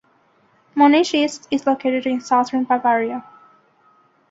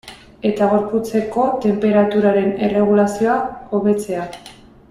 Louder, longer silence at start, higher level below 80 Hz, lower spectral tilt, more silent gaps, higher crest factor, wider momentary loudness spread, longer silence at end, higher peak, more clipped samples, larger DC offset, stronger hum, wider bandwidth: about the same, -18 LUFS vs -17 LUFS; first, 0.75 s vs 0.05 s; second, -66 dBFS vs -50 dBFS; second, -3.5 dB/octave vs -7 dB/octave; neither; about the same, 16 dB vs 14 dB; about the same, 9 LU vs 8 LU; first, 1.1 s vs 0.4 s; about the same, -4 dBFS vs -4 dBFS; neither; neither; neither; second, 7.8 kHz vs 13 kHz